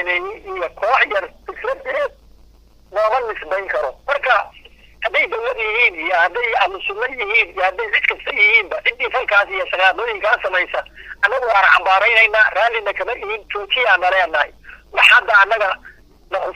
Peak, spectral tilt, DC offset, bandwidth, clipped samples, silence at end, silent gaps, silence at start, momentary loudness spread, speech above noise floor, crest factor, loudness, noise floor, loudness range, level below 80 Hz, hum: 0 dBFS; -2 dB/octave; under 0.1%; 15 kHz; under 0.1%; 0.05 s; none; 0 s; 13 LU; 31 dB; 18 dB; -16 LUFS; -48 dBFS; 6 LU; -48 dBFS; none